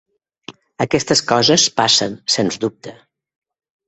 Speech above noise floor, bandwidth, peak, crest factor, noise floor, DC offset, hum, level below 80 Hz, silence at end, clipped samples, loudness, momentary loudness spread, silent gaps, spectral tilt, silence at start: 24 dB; 8.4 kHz; 0 dBFS; 18 dB; -40 dBFS; under 0.1%; none; -56 dBFS; 0.95 s; under 0.1%; -15 LUFS; 11 LU; none; -2.5 dB/octave; 0.5 s